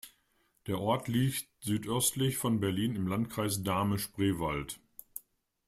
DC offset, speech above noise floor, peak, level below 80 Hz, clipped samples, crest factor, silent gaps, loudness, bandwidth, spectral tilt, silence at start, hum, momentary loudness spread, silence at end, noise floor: under 0.1%; 41 dB; -16 dBFS; -58 dBFS; under 0.1%; 18 dB; none; -32 LUFS; 16 kHz; -5 dB/octave; 0.05 s; none; 16 LU; 0.5 s; -73 dBFS